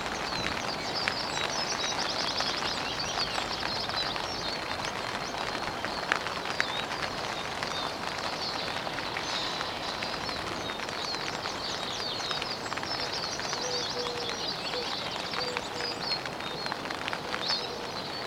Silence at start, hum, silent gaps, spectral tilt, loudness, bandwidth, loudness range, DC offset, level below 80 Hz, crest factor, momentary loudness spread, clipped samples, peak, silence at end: 0 s; none; none; -2 dB/octave; -31 LUFS; 16.5 kHz; 3 LU; under 0.1%; -56 dBFS; 28 dB; 4 LU; under 0.1%; -4 dBFS; 0 s